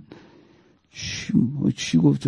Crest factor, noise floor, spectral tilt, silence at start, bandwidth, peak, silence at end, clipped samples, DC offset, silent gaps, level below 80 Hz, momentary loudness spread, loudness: 18 dB; -57 dBFS; -6 dB/octave; 0.1 s; 10.5 kHz; -6 dBFS; 0 s; under 0.1%; under 0.1%; none; -54 dBFS; 14 LU; -23 LUFS